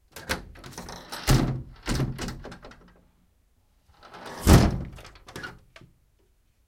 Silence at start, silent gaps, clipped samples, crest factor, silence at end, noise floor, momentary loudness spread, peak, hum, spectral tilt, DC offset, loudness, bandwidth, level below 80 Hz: 0.15 s; none; under 0.1%; 26 dB; 1.15 s; -65 dBFS; 25 LU; -2 dBFS; none; -5.5 dB/octave; under 0.1%; -25 LUFS; 17 kHz; -34 dBFS